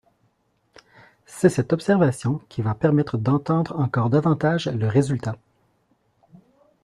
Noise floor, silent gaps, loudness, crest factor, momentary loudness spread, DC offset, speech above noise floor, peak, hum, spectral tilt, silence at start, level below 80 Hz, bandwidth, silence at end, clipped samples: -67 dBFS; none; -22 LUFS; 20 dB; 8 LU; under 0.1%; 46 dB; -4 dBFS; none; -7.5 dB/octave; 1.3 s; -56 dBFS; 12.5 kHz; 1.5 s; under 0.1%